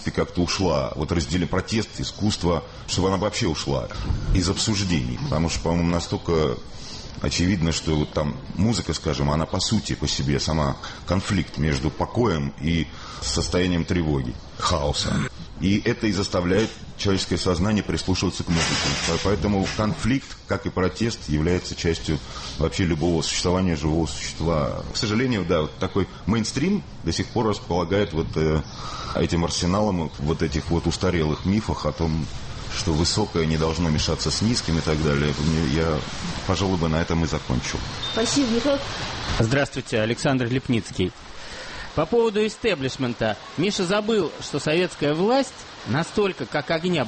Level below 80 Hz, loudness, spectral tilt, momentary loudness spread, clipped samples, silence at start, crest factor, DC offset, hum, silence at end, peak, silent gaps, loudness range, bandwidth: -36 dBFS; -24 LUFS; -5 dB/octave; 6 LU; under 0.1%; 0 s; 14 dB; under 0.1%; none; 0 s; -10 dBFS; none; 2 LU; 8.8 kHz